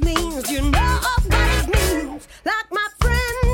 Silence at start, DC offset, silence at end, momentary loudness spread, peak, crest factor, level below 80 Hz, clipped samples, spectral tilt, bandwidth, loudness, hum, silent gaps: 0 s; under 0.1%; 0 s; 6 LU; -4 dBFS; 16 dB; -22 dBFS; under 0.1%; -4.5 dB/octave; 17.5 kHz; -20 LUFS; none; none